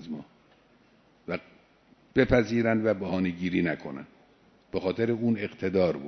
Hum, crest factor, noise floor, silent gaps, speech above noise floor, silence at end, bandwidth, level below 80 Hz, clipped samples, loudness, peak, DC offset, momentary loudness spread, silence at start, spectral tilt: none; 22 dB; -61 dBFS; none; 35 dB; 0 s; 6.4 kHz; -50 dBFS; under 0.1%; -28 LUFS; -6 dBFS; under 0.1%; 17 LU; 0 s; -7.5 dB/octave